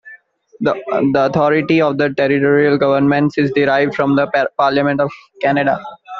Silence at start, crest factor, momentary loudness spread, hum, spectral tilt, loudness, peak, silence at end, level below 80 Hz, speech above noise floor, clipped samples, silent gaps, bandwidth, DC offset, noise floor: 0.05 s; 14 dB; 6 LU; none; -5 dB/octave; -15 LUFS; -2 dBFS; 0 s; -56 dBFS; 29 dB; under 0.1%; none; 6.6 kHz; under 0.1%; -43 dBFS